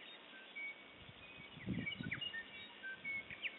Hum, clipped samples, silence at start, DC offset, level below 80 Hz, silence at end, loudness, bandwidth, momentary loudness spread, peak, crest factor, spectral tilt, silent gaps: none; under 0.1%; 0 s; under 0.1%; -70 dBFS; 0 s; -46 LUFS; 4 kHz; 12 LU; -30 dBFS; 18 dB; -2.5 dB/octave; none